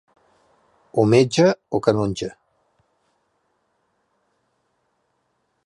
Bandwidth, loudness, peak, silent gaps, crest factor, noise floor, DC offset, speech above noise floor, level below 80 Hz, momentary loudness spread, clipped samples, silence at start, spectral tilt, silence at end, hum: 11 kHz; -19 LUFS; -2 dBFS; none; 22 dB; -71 dBFS; under 0.1%; 53 dB; -56 dBFS; 12 LU; under 0.1%; 0.95 s; -6 dB/octave; 3.35 s; none